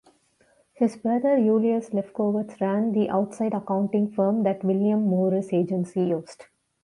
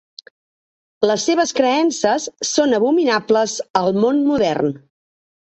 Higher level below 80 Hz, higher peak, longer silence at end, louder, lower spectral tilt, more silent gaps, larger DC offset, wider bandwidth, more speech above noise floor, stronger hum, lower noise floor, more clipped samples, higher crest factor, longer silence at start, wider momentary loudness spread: second, -70 dBFS vs -58 dBFS; second, -10 dBFS vs 0 dBFS; second, 0.4 s vs 0.8 s; second, -24 LUFS vs -17 LUFS; first, -9 dB/octave vs -4 dB/octave; second, none vs 3.70-3.74 s; neither; first, 11 kHz vs 8.4 kHz; second, 40 dB vs over 73 dB; neither; second, -63 dBFS vs under -90 dBFS; neither; about the same, 14 dB vs 18 dB; second, 0.8 s vs 1 s; about the same, 6 LU vs 5 LU